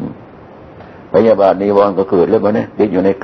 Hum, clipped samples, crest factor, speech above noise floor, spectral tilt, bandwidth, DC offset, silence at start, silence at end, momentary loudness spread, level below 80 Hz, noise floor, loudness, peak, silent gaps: none; under 0.1%; 14 dB; 25 dB; -9 dB/octave; 6.2 kHz; under 0.1%; 0 s; 0 s; 6 LU; -50 dBFS; -36 dBFS; -12 LUFS; 0 dBFS; none